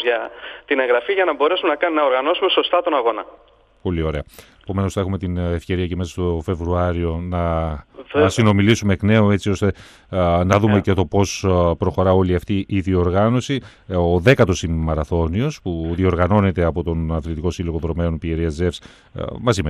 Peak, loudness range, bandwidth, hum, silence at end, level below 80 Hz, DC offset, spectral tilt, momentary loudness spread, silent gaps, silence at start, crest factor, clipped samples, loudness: -2 dBFS; 5 LU; 12.5 kHz; none; 0 s; -38 dBFS; under 0.1%; -6.5 dB/octave; 10 LU; none; 0 s; 18 dB; under 0.1%; -19 LUFS